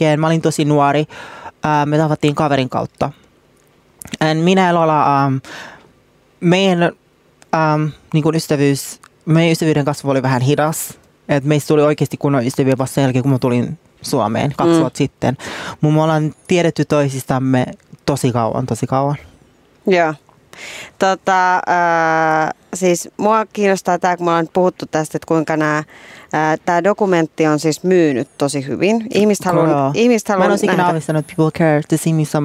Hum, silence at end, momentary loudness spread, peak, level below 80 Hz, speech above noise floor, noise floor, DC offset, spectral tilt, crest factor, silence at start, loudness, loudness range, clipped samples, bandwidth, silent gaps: none; 0 s; 9 LU; -2 dBFS; -54 dBFS; 37 dB; -53 dBFS; under 0.1%; -6 dB/octave; 14 dB; 0 s; -16 LUFS; 3 LU; under 0.1%; 16 kHz; none